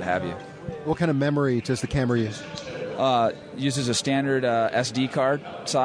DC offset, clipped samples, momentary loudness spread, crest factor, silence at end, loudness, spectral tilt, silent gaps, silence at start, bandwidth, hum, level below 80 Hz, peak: under 0.1%; under 0.1%; 11 LU; 14 dB; 0 s; -25 LUFS; -5 dB/octave; none; 0 s; 11 kHz; none; -50 dBFS; -10 dBFS